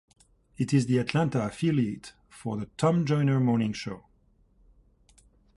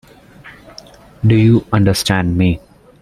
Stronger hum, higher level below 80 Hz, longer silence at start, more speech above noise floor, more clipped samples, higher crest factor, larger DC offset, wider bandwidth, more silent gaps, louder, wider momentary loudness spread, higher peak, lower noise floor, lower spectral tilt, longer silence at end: neither; second, -60 dBFS vs -38 dBFS; first, 0.6 s vs 0.45 s; first, 38 dB vs 28 dB; neither; about the same, 18 dB vs 16 dB; neither; second, 11.5 kHz vs 14.5 kHz; neither; second, -27 LUFS vs -14 LUFS; first, 15 LU vs 9 LU; second, -10 dBFS vs 0 dBFS; first, -64 dBFS vs -40 dBFS; about the same, -7 dB/octave vs -6 dB/octave; first, 1.6 s vs 0.45 s